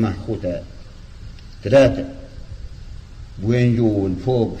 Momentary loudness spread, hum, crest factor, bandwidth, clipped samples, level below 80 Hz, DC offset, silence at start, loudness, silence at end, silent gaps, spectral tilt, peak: 25 LU; none; 16 dB; 9 kHz; under 0.1%; -36 dBFS; under 0.1%; 0 s; -19 LUFS; 0 s; none; -8 dB/octave; -4 dBFS